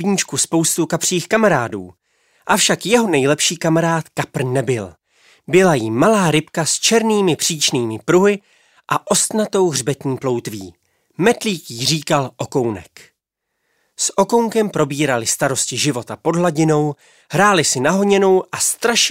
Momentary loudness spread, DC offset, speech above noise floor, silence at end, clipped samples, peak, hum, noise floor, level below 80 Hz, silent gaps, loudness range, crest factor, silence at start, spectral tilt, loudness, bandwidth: 9 LU; under 0.1%; 59 dB; 0 s; under 0.1%; -2 dBFS; none; -76 dBFS; -58 dBFS; none; 4 LU; 16 dB; 0 s; -3.5 dB/octave; -16 LUFS; 16 kHz